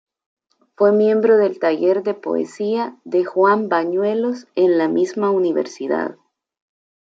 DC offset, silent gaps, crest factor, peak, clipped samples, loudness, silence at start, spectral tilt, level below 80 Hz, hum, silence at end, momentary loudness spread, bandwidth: under 0.1%; none; 14 dB; -4 dBFS; under 0.1%; -18 LUFS; 0.8 s; -6.5 dB/octave; -74 dBFS; none; 1 s; 8 LU; 7.8 kHz